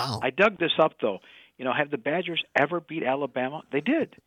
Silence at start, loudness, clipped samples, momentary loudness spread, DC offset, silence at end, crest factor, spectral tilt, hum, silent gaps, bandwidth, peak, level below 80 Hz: 0 s; -26 LUFS; under 0.1%; 8 LU; under 0.1%; 0.2 s; 20 dB; -5.5 dB/octave; none; none; 14.5 kHz; -8 dBFS; -72 dBFS